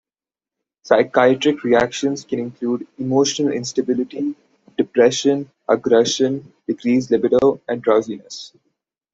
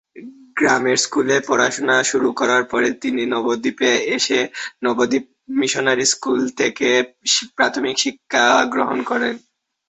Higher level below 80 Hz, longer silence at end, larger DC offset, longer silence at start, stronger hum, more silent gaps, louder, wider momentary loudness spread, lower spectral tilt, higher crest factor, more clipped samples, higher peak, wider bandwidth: about the same, -60 dBFS vs -62 dBFS; first, 0.65 s vs 0.5 s; neither; first, 0.85 s vs 0.15 s; neither; neither; about the same, -18 LUFS vs -18 LUFS; first, 12 LU vs 5 LU; first, -4.5 dB/octave vs -2 dB/octave; about the same, 18 dB vs 18 dB; neither; about the same, -2 dBFS vs -2 dBFS; about the same, 8 kHz vs 8.4 kHz